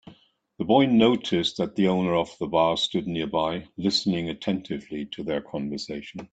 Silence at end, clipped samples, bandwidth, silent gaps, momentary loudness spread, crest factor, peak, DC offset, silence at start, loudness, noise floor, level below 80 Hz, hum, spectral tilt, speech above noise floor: 0.05 s; under 0.1%; 9 kHz; none; 13 LU; 20 dB; -6 dBFS; under 0.1%; 0.05 s; -25 LUFS; -57 dBFS; -58 dBFS; none; -5.5 dB/octave; 32 dB